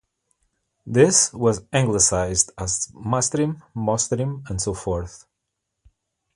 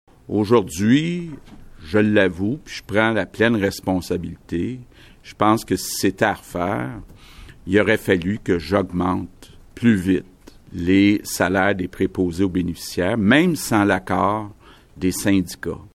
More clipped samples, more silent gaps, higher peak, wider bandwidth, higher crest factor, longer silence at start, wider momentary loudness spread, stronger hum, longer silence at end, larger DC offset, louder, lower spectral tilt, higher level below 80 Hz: neither; neither; about the same, -2 dBFS vs -4 dBFS; second, 11.5 kHz vs 16.5 kHz; first, 22 dB vs 16 dB; first, 0.85 s vs 0.3 s; about the same, 11 LU vs 12 LU; neither; first, 1.2 s vs 0.1 s; neither; about the same, -21 LUFS vs -20 LUFS; second, -4 dB/octave vs -5.5 dB/octave; about the same, -44 dBFS vs -46 dBFS